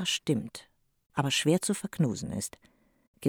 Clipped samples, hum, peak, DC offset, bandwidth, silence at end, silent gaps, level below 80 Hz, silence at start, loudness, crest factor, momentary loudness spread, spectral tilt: under 0.1%; none; -12 dBFS; under 0.1%; 19.5 kHz; 0 s; 1.06-1.10 s, 3.07-3.14 s; -62 dBFS; 0 s; -30 LUFS; 18 dB; 13 LU; -4.5 dB/octave